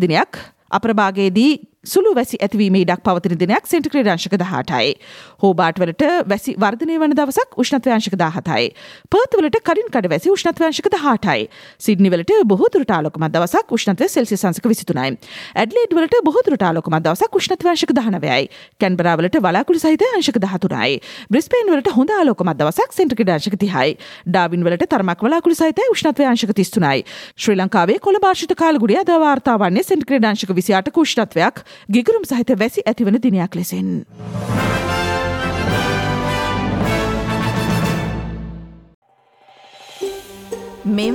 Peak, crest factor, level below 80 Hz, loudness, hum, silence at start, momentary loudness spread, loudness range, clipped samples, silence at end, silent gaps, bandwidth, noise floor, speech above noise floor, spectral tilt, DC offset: -2 dBFS; 14 dB; -42 dBFS; -17 LUFS; none; 0 s; 7 LU; 4 LU; under 0.1%; 0 s; 38.94-39.02 s; 16.5 kHz; -52 dBFS; 36 dB; -5.5 dB/octave; under 0.1%